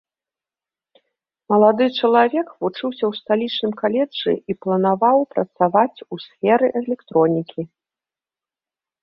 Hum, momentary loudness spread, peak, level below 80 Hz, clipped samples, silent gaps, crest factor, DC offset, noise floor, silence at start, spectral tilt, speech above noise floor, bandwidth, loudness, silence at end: none; 9 LU; -2 dBFS; -66 dBFS; under 0.1%; none; 18 dB; under 0.1%; under -90 dBFS; 1.5 s; -9 dB/octave; over 71 dB; 5.8 kHz; -19 LUFS; 1.35 s